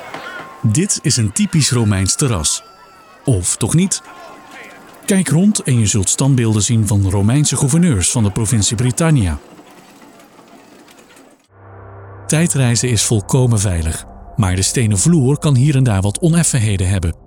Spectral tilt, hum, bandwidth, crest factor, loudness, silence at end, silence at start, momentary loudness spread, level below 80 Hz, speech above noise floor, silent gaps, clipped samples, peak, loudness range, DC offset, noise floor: -5 dB/octave; none; 17.5 kHz; 14 dB; -14 LUFS; 0.15 s; 0 s; 10 LU; -36 dBFS; 31 dB; none; under 0.1%; -2 dBFS; 6 LU; under 0.1%; -45 dBFS